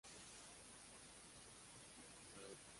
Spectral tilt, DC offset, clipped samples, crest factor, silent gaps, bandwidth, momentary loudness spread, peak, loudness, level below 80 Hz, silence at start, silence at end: -2 dB/octave; under 0.1%; under 0.1%; 18 dB; none; 11.5 kHz; 2 LU; -44 dBFS; -59 LUFS; -78 dBFS; 0.05 s; 0 s